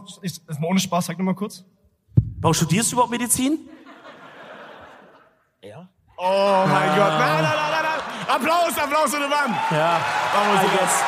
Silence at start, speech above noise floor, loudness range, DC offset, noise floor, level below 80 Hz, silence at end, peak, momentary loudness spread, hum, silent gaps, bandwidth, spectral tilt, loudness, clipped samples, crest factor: 0 s; 35 dB; 6 LU; under 0.1%; -56 dBFS; -48 dBFS; 0 s; -2 dBFS; 11 LU; none; none; 15.5 kHz; -4 dB/octave; -20 LUFS; under 0.1%; 20 dB